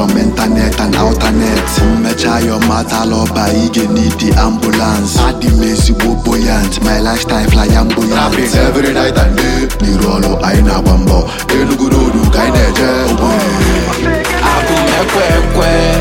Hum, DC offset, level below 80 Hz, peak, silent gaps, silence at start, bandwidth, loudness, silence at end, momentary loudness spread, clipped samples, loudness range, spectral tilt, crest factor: none; under 0.1%; -16 dBFS; 0 dBFS; none; 0 s; 17 kHz; -11 LUFS; 0 s; 2 LU; under 0.1%; 1 LU; -5 dB/octave; 10 dB